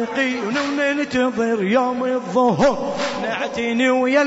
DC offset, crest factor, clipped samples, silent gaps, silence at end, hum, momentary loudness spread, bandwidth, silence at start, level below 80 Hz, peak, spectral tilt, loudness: under 0.1%; 16 dB; under 0.1%; none; 0 s; none; 6 LU; 8 kHz; 0 s; -52 dBFS; -4 dBFS; -5 dB/octave; -19 LUFS